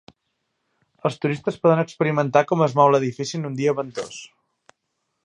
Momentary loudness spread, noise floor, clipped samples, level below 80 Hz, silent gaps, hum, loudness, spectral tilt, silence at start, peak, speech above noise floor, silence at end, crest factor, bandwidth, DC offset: 13 LU; -76 dBFS; under 0.1%; -68 dBFS; none; none; -21 LUFS; -6.5 dB/octave; 1.05 s; -2 dBFS; 55 dB; 1 s; 22 dB; 11 kHz; under 0.1%